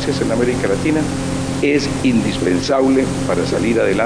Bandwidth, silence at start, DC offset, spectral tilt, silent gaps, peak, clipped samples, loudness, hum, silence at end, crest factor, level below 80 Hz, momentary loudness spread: 10.5 kHz; 0 s; under 0.1%; -5.5 dB/octave; none; -4 dBFS; under 0.1%; -17 LUFS; none; 0 s; 12 dB; -36 dBFS; 4 LU